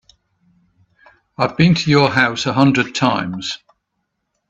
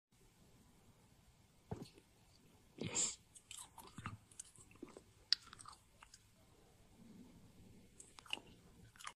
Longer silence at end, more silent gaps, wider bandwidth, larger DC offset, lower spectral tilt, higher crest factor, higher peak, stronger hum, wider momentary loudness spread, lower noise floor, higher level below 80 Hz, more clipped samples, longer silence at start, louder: first, 0.95 s vs 0 s; neither; second, 8 kHz vs 15 kHz; neither; first, -5.5 dB/octave vs -1.5 dB/octave; second, 18 dB vs 38 dB; first, 0 dBFS vs -14 dBFS; neither; second, 12 LU vs 26 LU; first, -73 dBFS vs -69 dBFS; first, -52 dBFS vs -74 dBFS; neither; first, 1.4 s vs 0.2 s; first, -16 LUFS vs -45 LUFS